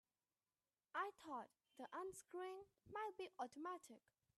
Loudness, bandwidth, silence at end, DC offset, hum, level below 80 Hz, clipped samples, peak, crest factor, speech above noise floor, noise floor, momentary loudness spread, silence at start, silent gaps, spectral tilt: -53 LUFS; 13 kHz; 0.4 s; under 0.1%; none; under -90 dBFS; under 0.1%; -34 dBFS; 20 dB; over 36 dB; under -90 dBFS; 12 LU; 0.95 s; none; -3.5 dB/octave